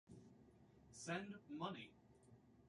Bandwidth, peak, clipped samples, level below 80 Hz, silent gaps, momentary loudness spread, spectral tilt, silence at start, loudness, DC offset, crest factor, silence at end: 11 kHz; -34 dBFS; under 0.1%; -80 dBFS; none; 21 LU; -4.5 dB/octave; 0.05 s; -51 LUFS; under 0.1%; 22 dB; 0 s